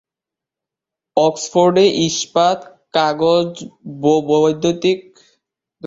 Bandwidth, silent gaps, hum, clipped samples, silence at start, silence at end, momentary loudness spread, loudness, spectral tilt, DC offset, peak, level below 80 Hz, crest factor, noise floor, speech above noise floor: 8 kHz; none; none; under 0.1%; 1.15 s; 0 s; 10 LU; -16 LUFS; -4.5 dB/octave; under 0.1%; -2 dBFS; -60 dBFS; 16 dB; -86 dBFS; 71 dB